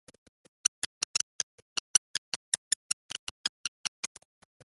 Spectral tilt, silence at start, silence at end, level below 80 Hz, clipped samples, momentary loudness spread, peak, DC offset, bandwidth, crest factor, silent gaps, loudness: 2.5 dB/octave; 1.95 s; 0.65 s; -74 dBFS; under 0.1%; 10 LU; -6 dBFS; under 0.1%; 12 kHz; 30 dB; 1.98-2.52 s, 2.58-3.09 s, 3.19-4.03 s; -32 LUFS